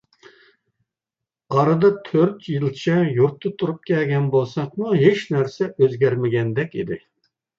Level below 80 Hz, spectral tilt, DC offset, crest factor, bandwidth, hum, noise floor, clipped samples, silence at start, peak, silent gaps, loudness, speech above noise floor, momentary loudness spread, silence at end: -62 dBFS; -8 dB/octave; under 0.1%; 18 dB; 7.4 kHz; none; -87 dBFS; under 0.1%; 1.5 s; -2 dBFS; none; -20 LUFS; 67 dB; 9 LU; 0.6 s